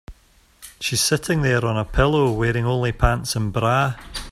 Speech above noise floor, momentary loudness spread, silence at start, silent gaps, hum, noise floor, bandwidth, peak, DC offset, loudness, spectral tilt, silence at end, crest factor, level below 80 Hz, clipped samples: 36 dB; 5 LU; 0.1 s; none; none; -55 dBFS; 15 kHz; -2 dBFS; under 0.1%; -20 LUFS; -4.5 dB/octave; 0 s; 20 dB; -32 dBFS; under 0.1%